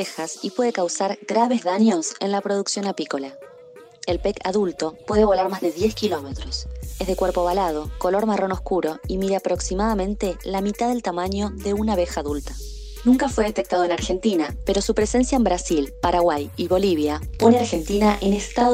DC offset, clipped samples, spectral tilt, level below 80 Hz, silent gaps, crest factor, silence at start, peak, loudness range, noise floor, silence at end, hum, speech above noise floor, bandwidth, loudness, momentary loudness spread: under 0.1%; under 0.1%; -5 dB/octave; -36 dBFS; none; 18 dB; 0 s; -2 dBFS; 4 LU; -45 dBFS; 0 s; none; 24 dB; 16 kHz; -22 LUFS; 9 LU